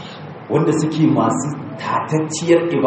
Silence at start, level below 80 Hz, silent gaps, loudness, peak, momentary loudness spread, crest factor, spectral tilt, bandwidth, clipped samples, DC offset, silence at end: 0 s; -62 dBFS; none; -18 LUFS; -2 dBFS; 11 LU; 16 dB; -6 dB/octave; 8.8 kHz; under 0.1%; under 0.1%; 0 s